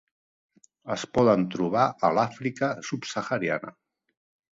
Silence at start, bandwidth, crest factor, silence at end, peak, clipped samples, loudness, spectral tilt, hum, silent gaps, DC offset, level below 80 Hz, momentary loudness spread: 0.85 s; 7.8 kHz; 22 dB; 0.8 s; -6 dBFS; under 0.1%; -26 LUFS; -5.5 dB/octave; none; none; under 0.1%; -60 dBFS; 11 LU